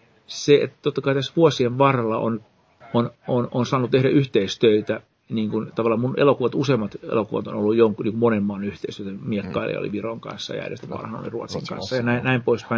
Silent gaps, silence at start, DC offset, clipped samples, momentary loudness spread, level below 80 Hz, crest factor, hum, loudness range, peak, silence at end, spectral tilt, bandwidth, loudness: none; 0.3 s; under 0.1%; under 0.1%; 13 LU; -58 dBFS; 20 dB; none; 6 LU; -2 dBFS; 0 s; -6.5 dB/octave; 7.6 kHz; -22 LUFS